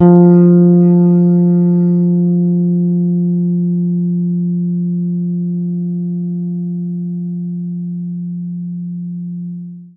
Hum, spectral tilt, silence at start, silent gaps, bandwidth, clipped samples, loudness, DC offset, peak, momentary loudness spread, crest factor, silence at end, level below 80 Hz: none; -15 dB/octave; 0 s; none; 1.5 kHz; under 0.1%; -14 LUFS; under 0.1%; 0 dBFS; 15 LU; 14 dB; 0.1 s; -60 dBFS